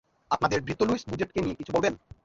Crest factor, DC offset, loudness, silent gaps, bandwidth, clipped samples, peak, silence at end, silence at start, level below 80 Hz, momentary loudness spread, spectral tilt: 20 dB; under 0.1%; -28 LUFS; none; 7.8 kHz; under 0.1%; -8 dBFS; 0.3 s; 0.3 s; -52 dBFS; 5 LU; -5.5 dB/octave